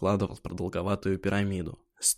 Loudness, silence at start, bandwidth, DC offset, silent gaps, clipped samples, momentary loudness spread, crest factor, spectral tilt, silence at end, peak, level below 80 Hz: -30 LUFS; 0 s; 15 kHz; under 0.1%; none; under 0.1%; 8 LU; 18 dB; -4.5 dB/octave; 0 s; -12 dBFS; -52 dBFS